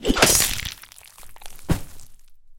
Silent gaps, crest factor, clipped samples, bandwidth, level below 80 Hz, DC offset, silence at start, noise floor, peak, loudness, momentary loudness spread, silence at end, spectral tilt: none; 24 dB; under 0.1%; 17 kHz; -36 dBFS; under 0.1%; 0 s; -45 dBFS; 0 dBFS; -19 LUFS; 23 LU; 0.05 s; -2.5 dB/octave